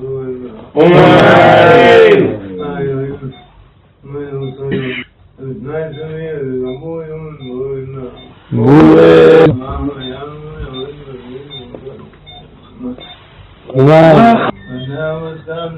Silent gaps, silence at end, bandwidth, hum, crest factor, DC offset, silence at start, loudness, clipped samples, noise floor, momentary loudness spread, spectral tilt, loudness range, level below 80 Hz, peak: none; 0 s; 8.8 kHz; none; 12 dB; under 0.1%; 0 s; -9 LUFS; 1%; -43 dBFS; 24 LU; -8 dB/octave; 17 LU; -38 dBFS; 0 dBFS